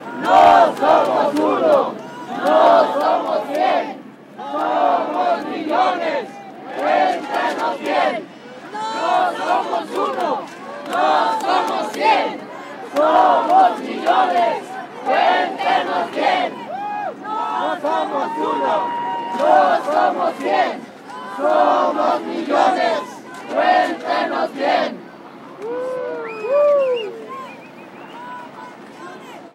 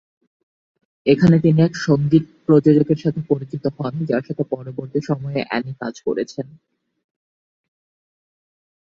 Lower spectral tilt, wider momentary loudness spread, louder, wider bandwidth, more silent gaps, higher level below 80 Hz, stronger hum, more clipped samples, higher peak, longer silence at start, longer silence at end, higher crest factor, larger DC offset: second, -4 dB/octave vs -8 dB/octave; first, 19 LU vs 12 LU; about the same, -18 LUFS vs -19 LUFS; first, 14 kHz vs 7.4 kHz; neither; second, -66 dBFS vs -56 dBFS; neither; neither; about the same, -2 dBFS vs -2 dBFS; second, 0 s vs 1.05 s; second, 0.05 s vs 2.45 s; about the same, 16 dB vs 18 dB; neither